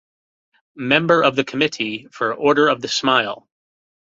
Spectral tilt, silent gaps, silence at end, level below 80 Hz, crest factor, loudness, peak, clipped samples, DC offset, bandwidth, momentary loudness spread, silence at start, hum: -4 dB/octave; none; 0.75 s; -62 dBFS; 18 dB; -18 LUFS; -2 dBFS; under 0.1%; under 0.1%; 7.8 kHz; 10 LU; 0.75 s; none